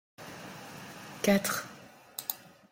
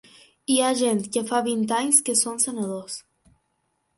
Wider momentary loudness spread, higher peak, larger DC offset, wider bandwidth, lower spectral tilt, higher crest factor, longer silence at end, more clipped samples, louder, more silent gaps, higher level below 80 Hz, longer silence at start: first, 19 LU vs 16 LU; second, -12 dBFS vs -4 dBFS; neither; first, 16.5 kHz vs 12 kHz; first, -4 dB/octave vs -2.5 dB/octave; about the same, 24 dB vs 20 dB; second, 0.35 s vs 0.95 s; neither; second, -31 LUFS vs -22 LUFS; neither; about the same, -70 dBFS vs -70 dBFS; second, 0.2 s vs 0.5 s